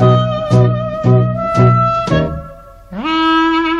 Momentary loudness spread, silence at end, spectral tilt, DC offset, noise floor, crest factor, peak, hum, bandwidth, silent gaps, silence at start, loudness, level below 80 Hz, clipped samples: 10 LU; 0 s; -7.5 dB/octave; under 0.1%; -35 dBFS; 12 dB; 0 dBFS; none; 7.2 kHz; none; 0 s; -13 LUFS; -34 dBFS; under 0.1%